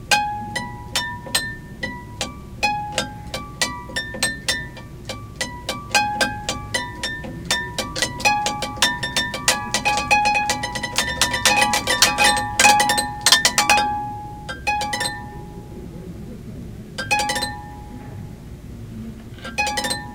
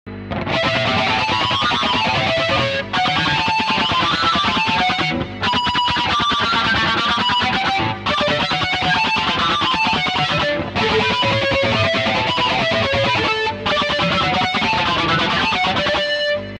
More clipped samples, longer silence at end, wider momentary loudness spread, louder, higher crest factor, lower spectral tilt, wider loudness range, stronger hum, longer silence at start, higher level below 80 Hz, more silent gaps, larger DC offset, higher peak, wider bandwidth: neither; about the same, 0 s vs 0 s; first, 21 LU vs 3 LU; second, -20 LUFS vs -17 LUFS; first, 22 dB vs 14 dB; second, -1.5 dB/octave vs -4 dB/octave; first, 11 LU vs 0 LU; neither; about the same, 0 s vs 0.05 s; about the same, -42 dBFS vs -42 dBFS; neither; neither; first, 0 dBFS vs -4 dBFS; first, 19 kHz vs 11.5 kHz